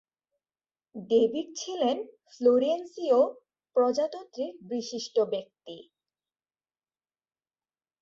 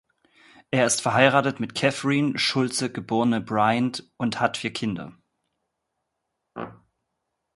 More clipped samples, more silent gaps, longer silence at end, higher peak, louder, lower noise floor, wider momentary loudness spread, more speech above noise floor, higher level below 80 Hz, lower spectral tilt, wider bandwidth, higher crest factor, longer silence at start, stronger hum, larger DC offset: neither; neither; first, 2.2 s vs 0.85 s; second, -12 dBFS vs 0 dBFS; second, -28 LUFS vs -23 LUFS; first, under -90 dBFS vs -80 dBFS; about the same, 21 LU vs 19 LU; first, over 62 dB vs 57 dB; second, -76 dBFS vs -64 dBFS; about the same, -4.5 dB/octave vs -4 dB/octave; second, 7.6 kHz vs 12 kHz; second, 18 dB vs 24 dB; first, 0.95 s vs 0.7 s; neither; neither